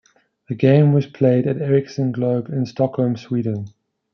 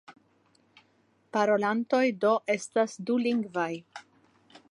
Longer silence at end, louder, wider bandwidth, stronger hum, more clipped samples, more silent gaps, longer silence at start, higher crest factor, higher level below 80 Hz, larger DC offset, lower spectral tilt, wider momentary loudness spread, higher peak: second, 0.45 s vs 0.7 s; first, -19 LUFS vs -28 LUFS; second, 6.4 kHz vs 11 kHz; neither; neither; neither; first, 0.5 s vs 0.1 s; about the same, 16 dB vs 18 dB; first, -64 dBFS vs -82 dBFS; neither; first, -9.5 dB/octave vs -5 dB/octave; about the same, 11 LU vs 9 LU; first, -2 dBFS vs -12 dBFS